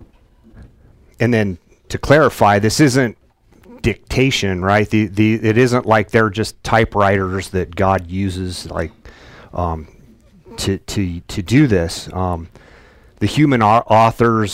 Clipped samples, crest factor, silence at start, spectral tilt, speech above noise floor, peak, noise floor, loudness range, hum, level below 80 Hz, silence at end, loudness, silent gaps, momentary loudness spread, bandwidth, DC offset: under 0.1%; 16 dB; 0.55 s; -6 dB/octave; 33 dB; 0 dBFS; -49 dBFS; 7 LU; none; -38 dBFS; 0 s; -16 LUFS; none; 12 LU; 16 kHz; under 0.1%